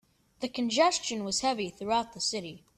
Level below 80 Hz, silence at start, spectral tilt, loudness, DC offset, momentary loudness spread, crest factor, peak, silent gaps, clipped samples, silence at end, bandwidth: -64 dBFS; 0.4 s; -2.5 dB/octave; -30 LUFS; under 0.1%; 11 LU; 22 dB; -10 dBFS; none; under 0.1%; 0.2 s; 13.5 kHz